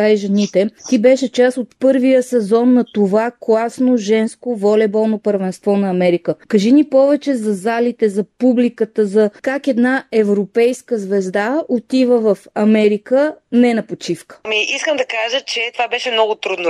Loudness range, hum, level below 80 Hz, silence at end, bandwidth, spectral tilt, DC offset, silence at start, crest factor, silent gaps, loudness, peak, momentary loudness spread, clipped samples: 2 LU; none; -66 dBFS; 0 s; 12 kHz; -5.5 dB/octave; under 0.1%; 0 s; 14 dB; none; -15 LUFS; -2 dBFS; 6 LU; under 0.1%